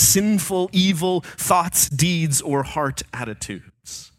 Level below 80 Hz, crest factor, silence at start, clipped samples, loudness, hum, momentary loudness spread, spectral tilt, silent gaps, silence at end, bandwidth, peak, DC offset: -46 dBFS; 18 dB; 0 s; under 0.1%; -20 LUFS; none; 15 LU; -3.5 dB/octave; none; 0.15 s; 17 kHz; -2 dBFS; under 0.1%